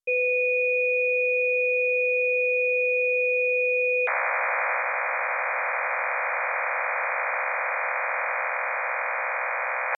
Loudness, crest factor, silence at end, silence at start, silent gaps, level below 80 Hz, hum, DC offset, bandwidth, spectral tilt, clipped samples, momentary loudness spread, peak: -24 LUFS; 10 dB; 0 s; 0.05 s; none; under -90 dBFS; none; under 0.1%; 6.8 kHz; -0.5 dB/octave; under 0.1%; 5 LU; -14 dBFS